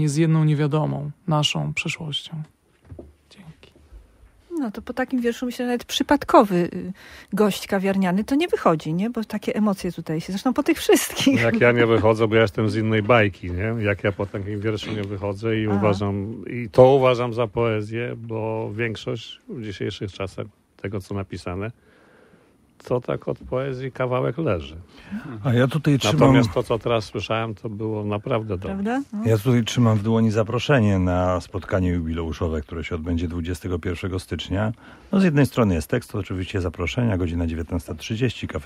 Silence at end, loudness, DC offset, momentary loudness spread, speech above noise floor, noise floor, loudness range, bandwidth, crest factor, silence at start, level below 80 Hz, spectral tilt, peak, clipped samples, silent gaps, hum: 0 s; -22 LUFS; under 0.1%; 13 LU; 34 dB; -56 dBFS; 10 LU; 16 kHz; 22 dB; 0 s; -44 dBFS; -6 dB/octave; 0 dBFS; under 0.1%; none; none